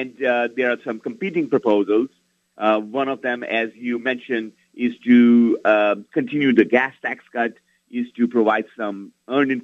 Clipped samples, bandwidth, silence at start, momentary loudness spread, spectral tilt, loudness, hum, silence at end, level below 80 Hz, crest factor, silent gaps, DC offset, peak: under 0.1%; 5.8 kHz; 0 s; 13 LU; -7 dB/octave; -20 LUFS; none; 0 s; -70 dBFS; 20 dB; none; under 0.1%; 0 dBFS